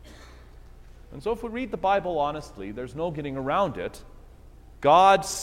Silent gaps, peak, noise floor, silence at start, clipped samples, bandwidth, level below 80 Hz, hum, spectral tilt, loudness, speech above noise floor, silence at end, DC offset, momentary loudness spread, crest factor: none; -6 dBFS; -48 dBFS; 0.05 s; under 0.1%; 15.5 kHz; -48 dBFS; none; -4.5 dB/octave; -24 LUFS; 24 dB; 0 s; under 0.1%; 19 LU; 20 dB